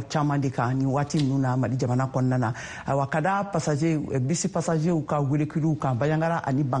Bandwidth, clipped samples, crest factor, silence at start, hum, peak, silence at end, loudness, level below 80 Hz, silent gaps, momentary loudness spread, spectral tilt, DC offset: 10 kHz; under 0.1%; 12 dB; 0 s; none; -12 dBFS; 0 s; -25 LUFS; -56 dBFS; none; 2 LU; -6.5 dB/octave; under 0.1%